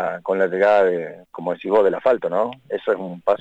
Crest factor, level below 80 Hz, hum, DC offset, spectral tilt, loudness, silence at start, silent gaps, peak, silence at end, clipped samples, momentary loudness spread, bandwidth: 14 dB; -64 dBFS; none; under 0.1%; -7 dB/octave; -20 LUFS; 0 s; none; -6 dBFS; 0.05 s; under 0.1%; 11 LU; 7.8 kHz